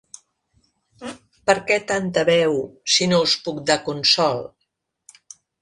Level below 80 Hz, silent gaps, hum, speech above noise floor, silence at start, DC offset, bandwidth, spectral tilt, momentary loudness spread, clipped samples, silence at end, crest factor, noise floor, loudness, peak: -60 dBFS; none; none; 55 dB; 1 s; under 0.1%; 11.5 kHz; -3 dB/octave; 20 LU; under 0.1%; 1.15 s; 20 dB; -75 dBFS; -19 LUFS; -2 dBFS